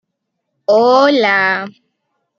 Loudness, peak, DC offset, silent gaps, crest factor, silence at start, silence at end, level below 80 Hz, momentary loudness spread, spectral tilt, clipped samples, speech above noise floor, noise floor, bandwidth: -12 LUFS; -2 dBFS; under 0.1%; none; 14 dB; 0.7 s; 0.7 s; -72 dBFS; 13 LU; -4.5 dB/octave; under 0.1%; 62 dB; -73 dBFS; 7.2 kHz